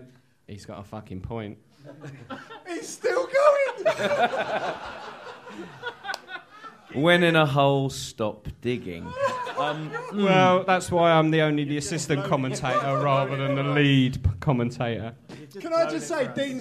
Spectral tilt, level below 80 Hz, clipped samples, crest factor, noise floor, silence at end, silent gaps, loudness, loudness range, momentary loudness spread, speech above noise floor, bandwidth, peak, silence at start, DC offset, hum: -5.5 dB/octave; -48 dBFS; under 0.1%; 20 dB; -46 dBFS; 0 s; none; -24 LUFS; 5 LU; 20 LU; 22 dB; 14 kHz; -4 dBFS; 0 s; under 0.1%; none